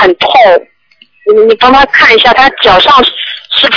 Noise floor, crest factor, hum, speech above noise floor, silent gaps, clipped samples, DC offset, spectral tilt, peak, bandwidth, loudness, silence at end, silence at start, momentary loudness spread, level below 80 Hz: -45 dBFS; 6 dB; none; 41 dB; none; 8%; under 0.1%; -3.5 dB/octave; 0 dBFS; 5.4 kHz; -5 LUFS; 0 s; 0 s; 8 LU; -34 dBFS